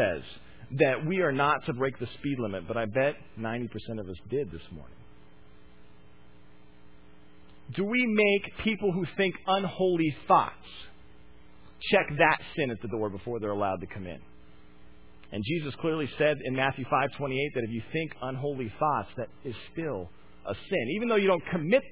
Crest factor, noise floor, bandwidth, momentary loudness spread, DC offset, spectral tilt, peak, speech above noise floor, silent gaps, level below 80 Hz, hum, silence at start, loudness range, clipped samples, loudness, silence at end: 22 dB; -57 dBFS; 4 kHz; 15 LU; 0.4%; -4 dB/octave; -8 dBFS; 28 dB; none; -56 dBFS; none; 0 s; 8 LU; under 0.1%; -29 LUFS; 0 s